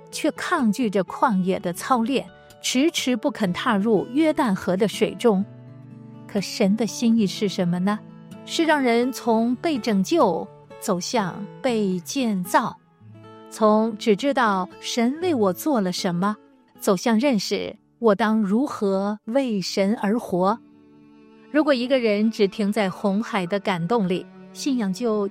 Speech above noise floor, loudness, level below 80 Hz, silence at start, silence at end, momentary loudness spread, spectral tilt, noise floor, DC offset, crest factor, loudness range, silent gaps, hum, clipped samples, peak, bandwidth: 29 dB; -22 LUFS; -66 dBFS; 0.05 s; 0 s; 8 LU; -5 dB/octave; -50 dBFS; under 0.1%; 18 dB; 2 LU; none; none; under 0.1%; -4 dBFS; 16 kHz